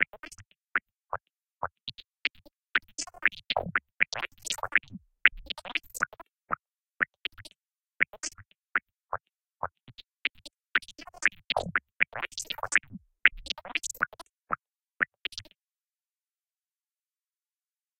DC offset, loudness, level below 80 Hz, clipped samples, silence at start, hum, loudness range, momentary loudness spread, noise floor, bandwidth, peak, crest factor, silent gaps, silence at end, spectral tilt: under 0.1%; -31 LUFS; -60 dBFS; under 0.1%; 0 s; none; 7 LU; 15 LU; under -90 dBFS; 16.5 kHz; 0 dBFS; 34 dB; none; 2.55 s; -1 dB/octave